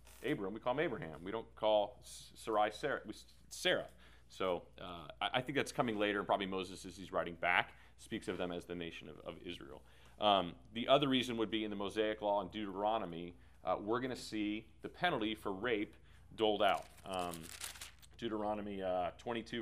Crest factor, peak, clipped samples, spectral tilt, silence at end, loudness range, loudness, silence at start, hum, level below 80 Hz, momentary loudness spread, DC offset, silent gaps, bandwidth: 26 dB; -12 dBFS; under 0.1%; -4.5 dB/octave; 0 s; 4 LU; -38 LUFS; 0.05 s; none; -66 dBFS; 16 LU; under 0.1%; none; 15.5 kHz